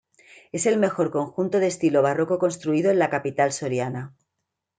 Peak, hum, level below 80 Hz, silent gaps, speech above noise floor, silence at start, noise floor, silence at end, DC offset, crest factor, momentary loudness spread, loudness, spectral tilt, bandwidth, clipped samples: -8 dBFS; none; -70 dBFS; none; 59 dB; 0.55 s; -81 dBFS; 0.7 s; under 0.1%; 16 dB; 8 LU; -23 LUFS; -5.5 dB/octave; 9.6 kHz; under 0.1%